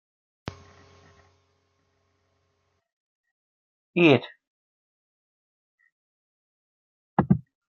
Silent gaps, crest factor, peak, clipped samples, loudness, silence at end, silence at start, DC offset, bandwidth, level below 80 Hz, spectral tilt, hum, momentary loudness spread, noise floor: 4.47-5.78 s, 5.92-7.17 s; 26 dB; -4 dBFS; under 0.1%; -23 LUFS; 0.3 s; 3.95 s; under 0.1%; 6.8 kHz; -60 dBFS; -5.5 dB/octave; none; 23 LU; -73 dBFS